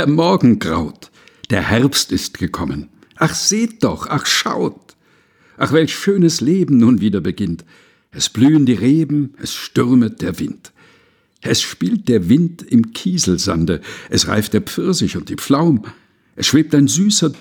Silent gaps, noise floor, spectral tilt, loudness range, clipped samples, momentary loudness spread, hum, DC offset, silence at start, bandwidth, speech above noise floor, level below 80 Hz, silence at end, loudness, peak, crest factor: none; -55 dBFS; -4.5 dB/octave; 3 LU; under 0.1%; 11 LU; none; under 0.1%; 0 s; 20 kHz; 40 dB; -44 dBFS; 0.05 s; -16 LUFS; 0 dBFS; 16 dB